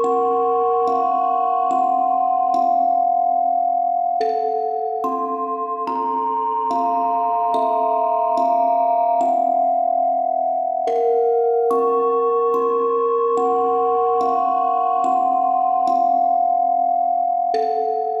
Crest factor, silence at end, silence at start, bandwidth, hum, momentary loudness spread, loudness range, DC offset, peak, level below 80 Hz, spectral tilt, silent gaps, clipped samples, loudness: 10 dB; 0 s; 0 s; 8 kHz; none; 4 LU; 3 LU; under 0.1%; -8 dBFS; -74 dBFS; -5.5 dB/octave; none; under 0.1%; -19 LUFS